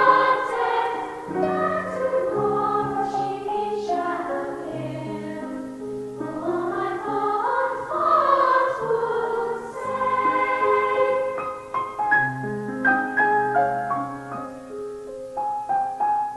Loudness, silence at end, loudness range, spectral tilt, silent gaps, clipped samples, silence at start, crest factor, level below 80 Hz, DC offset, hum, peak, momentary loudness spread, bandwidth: -23 LUFS; 0 s; 6 LU; -6 dB/octave; none; under 0.1%; 0 s; 20 dB; -58 dBFS; under 0.1%; none; -4 dBFS; 12 LU; 12 kHz